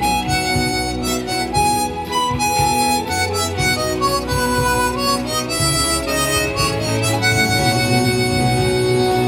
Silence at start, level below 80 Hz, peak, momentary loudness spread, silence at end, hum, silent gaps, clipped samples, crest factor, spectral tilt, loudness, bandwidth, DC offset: 0 s; -34 dBFS; -2 dBFS; 4 LU; 0 s; none; none; under 0.1%; 14 dB; -3.5 dB/octave; -17 LUFS; 16.5 kHz; under 0.1%